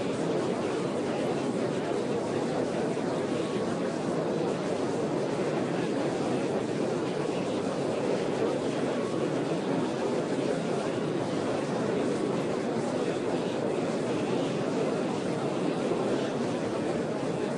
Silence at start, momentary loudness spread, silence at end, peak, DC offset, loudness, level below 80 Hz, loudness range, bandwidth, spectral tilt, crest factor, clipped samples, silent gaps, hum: 0 s; 1 LU; 0 s; -16 dBFS; under 0.1%; -30 LUFS; -66 dBFS; 0 LU; 11 kHz; -6 dB/octave; 14 dB; under 0.1%; none; none